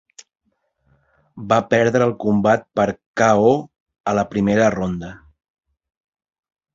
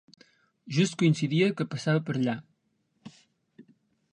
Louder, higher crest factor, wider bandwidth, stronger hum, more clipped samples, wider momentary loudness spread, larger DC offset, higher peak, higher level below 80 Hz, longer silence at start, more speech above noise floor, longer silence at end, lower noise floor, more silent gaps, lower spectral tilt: first, -18 LUFS vs -27 LUFS; about the same, 18 dB vs 18 dB; second, 7.6 kHz vs 10 kHz; neither; neither; first, 11 LU vs 7 LU; neither; first, -2 dBFS vs -12 dBFS; first, -50 dBFS vs -74 dBFS; first, 1.35 s vs 0.65 s; about the same, 50 dB vs 48 dB; first, 1.6 s vs 0.5 s; second, -67 dBFS vs -74 dBFS; first, 3.06-3.14 s, 3.80-3.86 s, 4.00-4.04 s vs none; about the same, -6.5 dB/octave vs -6 dB/octave